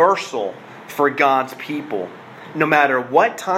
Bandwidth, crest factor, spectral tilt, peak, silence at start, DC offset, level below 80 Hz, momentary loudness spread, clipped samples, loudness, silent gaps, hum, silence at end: 16 kHz; 18 dB; -4.5 dB/octave; -2 dBFS; 0 s; under 0.1%; -72 dBFS; 17 LU; under 0.1%; -18 LUFS; none; none; 0 s